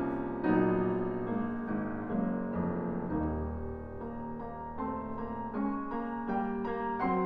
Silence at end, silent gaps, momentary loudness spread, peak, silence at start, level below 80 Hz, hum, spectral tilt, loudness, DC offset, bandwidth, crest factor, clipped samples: 0 s; none; 11 LU; -16 dBFS; 0 s; -48 dBFS; none; -11 dB/octave; -34 LUFS; under 0.1%; 5 kHz; 16 dB; under 0.1%